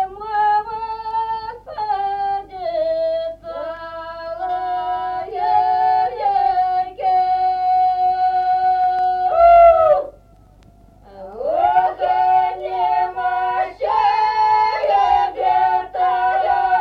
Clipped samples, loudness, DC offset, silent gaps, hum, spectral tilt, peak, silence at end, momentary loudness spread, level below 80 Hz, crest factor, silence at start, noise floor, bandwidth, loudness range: under 0.1%; -17 LUFS; under 0.1%; none; none; -5 dB/octave; -2 dBFS; 0 s; 11 LU; -48 dBFS; 16 dB; 0 s; -48 dBFS; 6 kHz; 8 LU